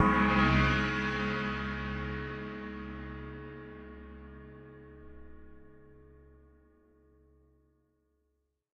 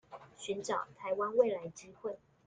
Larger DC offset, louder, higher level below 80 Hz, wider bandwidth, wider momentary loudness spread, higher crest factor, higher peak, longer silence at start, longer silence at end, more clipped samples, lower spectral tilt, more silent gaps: neither; first, -31 LUFS vs -36 LUFS; first, -44 dBFS vs -76 dBFS; second, 8.2 kHz vs 9.4 kHz; first, 26 LU vs 16 LU; about the same, 22 dB vs 22 dB; about the same, -12 dBFS vs -14 dBFS; about the same, 0 s vs 0.1 s; first, 2.75 s vs 0.3 s; neither; first, -6.5 dB/octave vs -4 dB/octave; neither